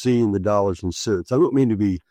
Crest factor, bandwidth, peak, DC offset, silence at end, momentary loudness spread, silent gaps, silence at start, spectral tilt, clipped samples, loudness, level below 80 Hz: 12 dB; 12.5 kHz; -6 dBFS; under 0.1%; 0.1 s; 6 LU; none; 0 s; -7 dB/octave; under 0.1%; -20 LUFS; -48 dBFS